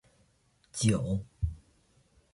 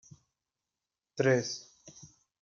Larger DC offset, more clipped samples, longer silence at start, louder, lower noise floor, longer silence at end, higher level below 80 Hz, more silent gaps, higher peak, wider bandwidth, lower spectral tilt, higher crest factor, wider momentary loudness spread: neither; neither; second, 0.75 s vs 1.15 s; about the same, -32 LUFS vs -31 LUFS; second, -69 dBFS vs under -90 dBFS; first, 0.75 s vs 0.35 s; first, -44 dBFS vs -78 dBFS; neither; about the same, -14 dBFS vs -14 dBFS; first, 11.5 kHz vs 7.4 kHz; about the same, -5.5 dB/octave vs -5 dB/octave; about the same, 20 dB vs 22 dB; second, 14 LU vs 24 LU